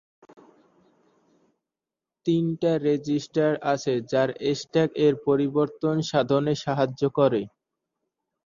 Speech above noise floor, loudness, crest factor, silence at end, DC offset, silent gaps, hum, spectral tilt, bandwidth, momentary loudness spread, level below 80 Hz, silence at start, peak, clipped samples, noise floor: 65 dB; -24 LUFS; 20 dB; 1 s; under 0.1%; none; none; -6.5 dB/octave; 7.4 kHz; 4 LU; -64 dBFS; 2.25 s; -6 dBFS; under 0.1%; -89 dBFS